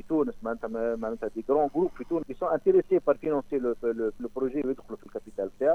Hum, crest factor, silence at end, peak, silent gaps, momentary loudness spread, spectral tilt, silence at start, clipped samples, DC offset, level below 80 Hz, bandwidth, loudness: none; 18 dB; 0 s; -10 dBFS; none; 11 LU; -8.5 dB/octave; 0.05 s; under 0.1%; under 0.1%; -54 dBFS; 6.4 kHz; -29 LUFS